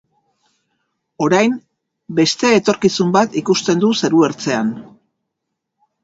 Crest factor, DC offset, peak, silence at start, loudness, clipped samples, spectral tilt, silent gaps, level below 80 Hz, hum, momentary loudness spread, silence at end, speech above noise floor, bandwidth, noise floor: 18 dB; under 0.1%; 0 dBFS; 1.2 s; -16 LUFS; under 0.1%; -4.5 dB/octave; none; -60 dBFS; none; 8 LU; 1.2 s; 62 dB; 8 kHz; -77 dBFS